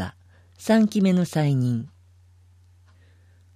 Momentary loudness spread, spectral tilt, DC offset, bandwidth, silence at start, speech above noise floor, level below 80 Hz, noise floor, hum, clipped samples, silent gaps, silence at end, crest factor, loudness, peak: 15 LU; -7 dB/octave; under 0.1%; 14.5 kHz; 0 s; 34 dB; -62 dBFS; -54 dBFS; none; under 0.1%; none; 1.7 s; 16 dB; -22 LUFS; -8 dBFS